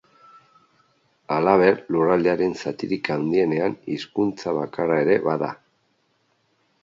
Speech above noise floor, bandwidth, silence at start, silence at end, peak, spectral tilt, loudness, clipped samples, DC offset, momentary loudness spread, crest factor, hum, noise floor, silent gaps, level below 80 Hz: 46 dB; 7.6 kHz; 1.3 s; 1.3 s; -2 dBFS; -7 dB/octave; -22 LUFS; under 0.1%; under 0.1%; 10 LU; 20 dB; none; -67 dBFS; none; -62 dBFS